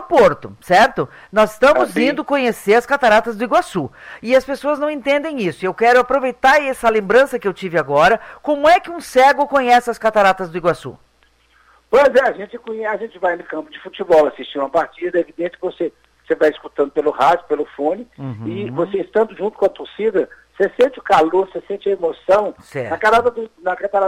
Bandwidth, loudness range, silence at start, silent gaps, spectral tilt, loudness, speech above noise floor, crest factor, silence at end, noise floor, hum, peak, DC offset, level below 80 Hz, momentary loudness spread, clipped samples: 16 kHz; 5 LU; 0 s; none; -5 dB/octave; -16 LUFS; 40 dB; 14 dB; 0 s; -56 dBFS; none; -2 dBFS; under 0.1%; -50 dBFS; 12 LU; under 0.1%